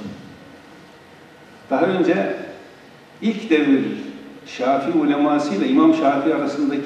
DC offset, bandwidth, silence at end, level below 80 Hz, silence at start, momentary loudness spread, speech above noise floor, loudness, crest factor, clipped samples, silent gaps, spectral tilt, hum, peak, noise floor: under 0.1%; 9.2 kHz; 0 s; -68 dBFS; 0 s; 20 LU; 27 dB; -19 LUFS; 16 dB; under 0.1%; none; -6.5 dB/octave; none; -4 dBFS; -45 dBFS